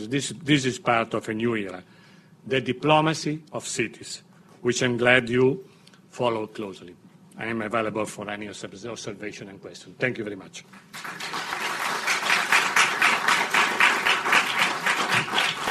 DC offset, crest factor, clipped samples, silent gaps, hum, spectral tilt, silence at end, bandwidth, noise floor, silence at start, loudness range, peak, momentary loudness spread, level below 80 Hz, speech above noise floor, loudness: under 0.1%; 22 dB; under 0.1%; none; none; -3.5 dB/octave; 0 s; 14 kHz; -52 dBFS; 0 s; 12 LU; -4 dBFS; 18 LU; -64 dBFS; 26 dB; -23 LUFS